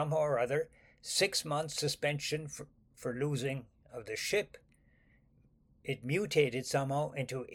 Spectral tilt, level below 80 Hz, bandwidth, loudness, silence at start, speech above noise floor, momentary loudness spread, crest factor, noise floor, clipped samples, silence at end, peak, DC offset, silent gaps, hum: -4 dB/octave; -68 dBFS; 17 kHz; -34 LUFS; 0 s; 33 dB; 16 LU; 20 dB; -67 dBFS; under 0.1%; 0 s; -16 dBFS; under 0.1%; none; none